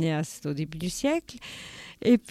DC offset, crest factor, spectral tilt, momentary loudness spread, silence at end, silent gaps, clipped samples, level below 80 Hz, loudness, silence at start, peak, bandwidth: under 0.1%; 18 dB; -5.5 dB/octave; 17 LU; 0 s; none; under 0.1%; -56 dBFS; -29 LUFS; 0 s; -10 dBFS; 15 kHz